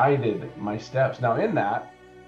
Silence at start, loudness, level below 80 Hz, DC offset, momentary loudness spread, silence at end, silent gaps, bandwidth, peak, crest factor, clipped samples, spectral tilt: 0 s; -26 LUFS; -62 dBFS; under 0.1%; 9 LU; 0.05 s; none; 7.4 kHz; -8 dBFS; 16 dB; under 0.1%; -8 dB/octave